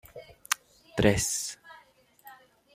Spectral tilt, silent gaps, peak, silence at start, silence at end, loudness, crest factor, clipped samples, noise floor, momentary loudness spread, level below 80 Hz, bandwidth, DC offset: -3.5 dB/octave; none; -4 dBFS; 0.15 s; 0.4 s; -29 LUFS; 28 dB; under 0.1%; -60 dBFS; 23 LU; -52 dBFS; 16 kHz; under 0.1%